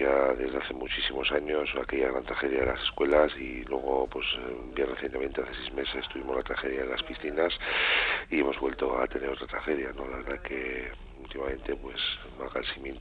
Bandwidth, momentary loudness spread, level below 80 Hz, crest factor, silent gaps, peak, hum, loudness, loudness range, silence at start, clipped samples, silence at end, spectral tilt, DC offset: 5.4 kHz; 11 LU; -46 dBFS; 22 dB; none; -8 dBFS; none; -30 LUFS; 6 LU; 0 s; under 0.1%; 0 s; -6 dB/octave; under 0.1%